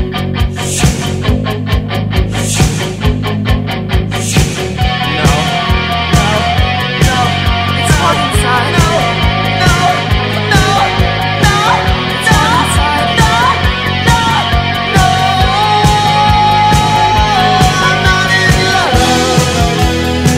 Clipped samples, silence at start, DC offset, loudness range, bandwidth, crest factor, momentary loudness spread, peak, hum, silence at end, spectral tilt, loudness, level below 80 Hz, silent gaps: under 0.1%; 0 s; under 0.1%; 5 LU; 16 kHz; 10 dB; 6 LU; 0 dBFS; none; 0 s; -4.5 dB/octave; -11 LUFS; -20 dBFS; none